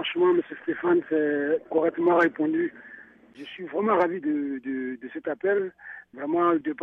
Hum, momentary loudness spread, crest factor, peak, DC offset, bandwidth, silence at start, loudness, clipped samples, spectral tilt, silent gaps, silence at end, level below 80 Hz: none; 16 LU; 16 dB; -10 dBFS; under 0.1%; 4 kHz; 0 s; -25 LUFS; under 0.1%; -7.5 dB/octave; none; 0 s; -72 dBFS